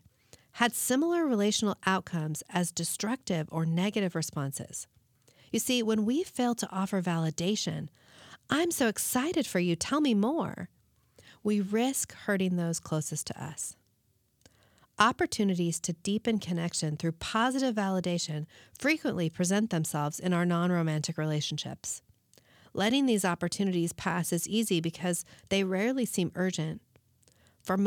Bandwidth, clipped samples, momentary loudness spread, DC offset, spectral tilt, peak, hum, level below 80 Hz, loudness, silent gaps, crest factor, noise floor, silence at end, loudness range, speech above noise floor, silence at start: 19 kHz; under 0.1%; 9 LU; under 0.1%; -4.5 dB/octave; -8 dBFS; none; -68 dBFS; -30 LUFS; none; 22 dB; -72 dBFS; 0 s; 3 LU; 42 dB; 0.55 s